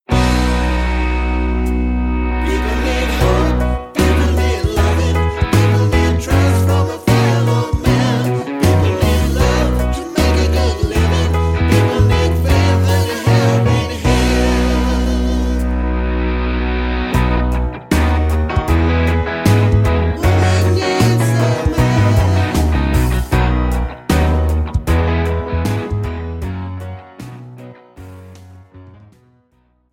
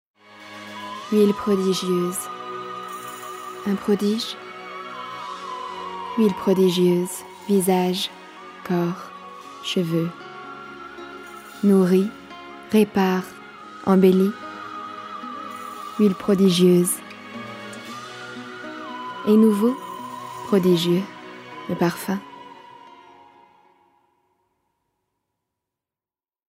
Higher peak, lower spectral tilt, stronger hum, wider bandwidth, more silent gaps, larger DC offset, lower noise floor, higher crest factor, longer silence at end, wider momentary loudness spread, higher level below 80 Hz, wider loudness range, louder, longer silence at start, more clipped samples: first, 0 dBFS vs -4 dBFS; about the same, -6.5 dB/octave vs -6 dB/octave; neither; about the same, 16.5 kHz vs 16 kHz; neither; neither; second, -58 dBFS vs under -90 dBFS; about the same, 14 dB vs 18 dB; second, 1 s vs 3.6 s; second, 6 LU vs 20 LU; first, -20 dBFS vs -66 dBFS; second, 4 LU vs 7 LU; first, -15 LUFS vs -22 LUFS; second, 0.1 s vs 0.3 s; neither